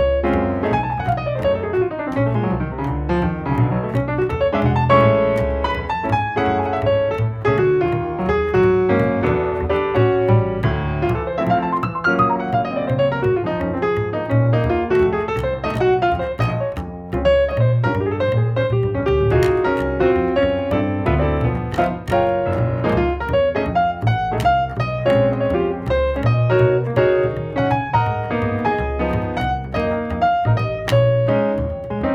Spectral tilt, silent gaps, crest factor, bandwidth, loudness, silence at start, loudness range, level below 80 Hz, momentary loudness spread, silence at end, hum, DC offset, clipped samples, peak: -8.5 dB/octave; none; 16 dB; 7.4 kHz; -19 LUFS; 0 s; 2 LU; -32 dBFS; 5 LU; 0 s; none; under 0.1%; under 0.1%; -2 dBFS